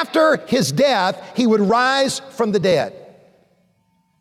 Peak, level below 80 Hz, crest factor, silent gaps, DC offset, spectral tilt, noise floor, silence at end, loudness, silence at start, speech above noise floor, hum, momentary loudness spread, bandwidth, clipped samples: -6 dBFS; -60 dBFS; 12 dB; none; under 0.1%; -4.5 dB/octave; -63 dBFS; 1.2 s; -17 LUFS; 0 s; 46 dB; none; 6 LU; 15.5 kHz; under 0.1%